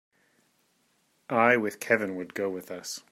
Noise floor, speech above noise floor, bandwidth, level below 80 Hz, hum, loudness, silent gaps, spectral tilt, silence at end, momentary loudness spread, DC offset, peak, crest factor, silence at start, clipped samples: -70 dBFS; 43 dB; 16 kHz; -78 dBFS; none; -27 LUFS; none; -4.5 dB/octave; 0.15 s; 14 LU; under 0.1%; -8 dBFS; 22 dB; 1.3 s; under 0.1%